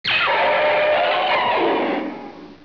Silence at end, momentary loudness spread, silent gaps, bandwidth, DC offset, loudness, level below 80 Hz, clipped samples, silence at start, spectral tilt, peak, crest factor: 0.1 s; 13 LU; none; 5.4 kHz; 0.2%; -18 LUFS; -60 dBFS; under 0.1%; 0.05 s; -5 dB/octave; -8 dBFS; 10 dB